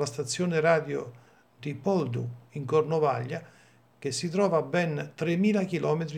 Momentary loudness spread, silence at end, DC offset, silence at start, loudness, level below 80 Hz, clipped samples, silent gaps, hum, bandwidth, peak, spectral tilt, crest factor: 13 LU; 0 s; under 0.1%; 0 s; -28 LUFS; -76 dBFS; under 0.1%; none; none; 14 kHz; -10 dBFS; -6 dB/octave; 20 dB